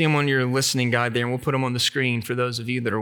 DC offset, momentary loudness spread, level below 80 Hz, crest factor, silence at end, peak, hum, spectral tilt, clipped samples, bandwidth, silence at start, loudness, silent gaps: under 0.1%; 5 LU; -62 dBFS; 16 dB; 0 s; -6 dBFS; none; -4.5 dB/octave; under 0.1%; over 20 kHz; 0 s; -22 LUFS; none